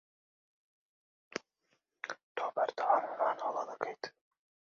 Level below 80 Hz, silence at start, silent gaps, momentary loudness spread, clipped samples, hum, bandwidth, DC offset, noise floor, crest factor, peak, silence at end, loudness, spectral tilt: under -90 dBFS; 1.3 s; 2.23-2.35 s; 15 LU; under 0.1%; none; 7.4 kHz; under 0.1%; -80 dBFS; 24 dB; -14 dBFS; 0.7 s; -36 LUFS; -0.5 dB/octave